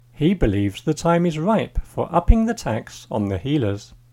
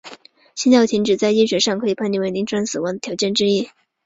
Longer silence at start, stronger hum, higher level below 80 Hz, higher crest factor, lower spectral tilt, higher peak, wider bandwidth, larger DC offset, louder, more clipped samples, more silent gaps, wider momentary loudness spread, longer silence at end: first, 0.2 s vs 0.05 s; neither; first, -28 dBFS vs -60 dBFS; about the same, 20 dB vs 18 dB; first, -7 dB/octave vs -4 dB/octave; about the same, 0 dBFS vs -2 dBFS; first, 16 kHz vs 8 kHz; neither; second, -21 LUFS vs -18 LUFS; neither; neither; about the same, 9 LU vs 9 LU; second, 0.25 s vs 0.4 s